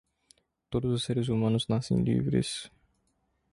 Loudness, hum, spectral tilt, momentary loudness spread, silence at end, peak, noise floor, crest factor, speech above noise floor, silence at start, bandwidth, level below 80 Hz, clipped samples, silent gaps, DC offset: -29 LUFS; none; -6.5 dB/octave; 8 LU; 0.85 s; -14 dBFS; -74 dBFS; 16 dB; 47 dB; 0.7 s; 11.5 kHz; -54 dBFS; under 0.1%; none; under 0.1%